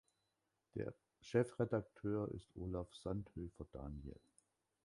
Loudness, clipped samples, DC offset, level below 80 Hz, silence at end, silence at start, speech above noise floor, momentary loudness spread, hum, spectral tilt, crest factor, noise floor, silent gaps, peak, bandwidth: -45 LUFS; under 0.1%; under 0.1%; -60 dBFS; 0.7 s; 0.75 s; 44 dB; 13 LU; none; -8 dB/octave; 22 dB; -87 dBFS; none; -22 dBFS; 11.5 kHz